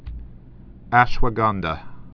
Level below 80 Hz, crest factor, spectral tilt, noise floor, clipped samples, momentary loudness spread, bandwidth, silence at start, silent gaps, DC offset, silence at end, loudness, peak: -30 dBFS; 22 dB; -7 dB/octave; -42 dBFS; under 0.1%; 19 LU; 5.4 kHz; 0.05 s; none; under 0.1%; 0.1 s; -21 LUFS; 0 dBFS